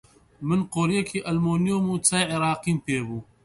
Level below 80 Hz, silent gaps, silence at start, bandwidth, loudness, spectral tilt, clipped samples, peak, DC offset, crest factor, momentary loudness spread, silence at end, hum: -56 dBFS; none; 0.4 s; 11.5 kHz; -24 LUFS; -4.5 dB/octave; under 0.1%; -6 dBFS; under 0.1%; 18 dB; 7 LU; 0.2 s; none